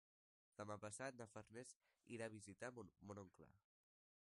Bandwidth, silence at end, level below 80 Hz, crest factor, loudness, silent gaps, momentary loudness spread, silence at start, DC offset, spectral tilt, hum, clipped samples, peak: 11.5 kHz; 0.75 s; -84 dBFS; 22 dB; -56 LUFS; 1.76-1.80 s; 8 LU; 0.6 s; under 0.1%; -4.5 dB/octave; none; under 0.1%; -36 dBFS